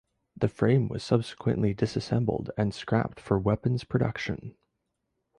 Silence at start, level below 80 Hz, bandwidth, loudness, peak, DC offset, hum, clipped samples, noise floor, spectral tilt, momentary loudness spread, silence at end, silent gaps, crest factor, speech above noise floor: 0.35 s; -52 dBFS; 10.5 kHz; -28 LUFS; -10 dBFS; under 0.1%; none; under 0.1%; -80 dBFS; -7.5 dB/octave; 6 LU; 0.9 s; none; 20 dB; 53 dB